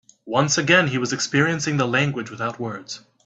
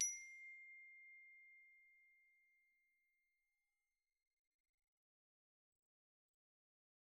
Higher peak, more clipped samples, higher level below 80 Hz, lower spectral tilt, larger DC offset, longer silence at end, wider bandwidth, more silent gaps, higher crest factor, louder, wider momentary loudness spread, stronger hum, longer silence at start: first, -2 dBFS vs -28 dBFS; neither; first, -60 dBFS vs under -90 dBFS; first, -4 dB/octave vs 5.5 dB/octave; neither; second, 0.25 s vs 4.9 s; second, 8.4 kHz vs 11.5 kHz; neither; second, 20 dB vs 30 dB; first, -21 LUFS vs -52 LUFS; about the same, 14 LU vs 16 LU; neither; first, 0.25 s vs 0 s